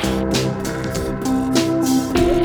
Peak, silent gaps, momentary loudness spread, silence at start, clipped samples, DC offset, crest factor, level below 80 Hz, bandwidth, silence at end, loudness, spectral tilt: -4 dBFS; none; 6 LU; 0 s; under 0.1%; under 0.1%; 16 dB; -32 dBFS; over 20 kHz; 0 s; -19 LUFS; -5 dB/octave